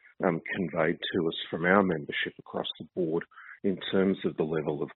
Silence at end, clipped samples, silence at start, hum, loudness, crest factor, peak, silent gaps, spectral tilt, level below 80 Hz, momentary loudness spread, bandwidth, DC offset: 0.05 s; under 0.1%; 0.2 s; none; -30 LUFS; 22 dB; -8 dBFS; none; -4 dB/octave; -68 dBFS; 10 LU; 4.2 kHz; under 0.1%